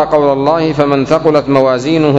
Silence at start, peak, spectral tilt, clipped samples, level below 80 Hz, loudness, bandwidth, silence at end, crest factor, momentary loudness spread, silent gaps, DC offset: 0 s; 0 dBFS; -7 dB/octave; 0.8%; -42 dBFS; -11 LUFS; 8.4 kHz; 0 s; 10 dB; 2 LU; none; under 0.1%